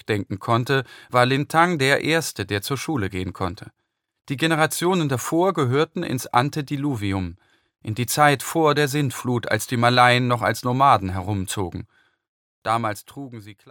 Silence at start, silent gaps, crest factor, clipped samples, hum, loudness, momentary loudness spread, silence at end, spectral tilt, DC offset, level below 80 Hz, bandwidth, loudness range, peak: 0.1 s; 12.28-12.62 s; 20 dB; under 0.1%; none; -21 LUFS; 13 LU; 0 s; -5 dB/octave; under 0.1%; -58 dBFS; 17.5 kHz; 4 LU; -2 dBFS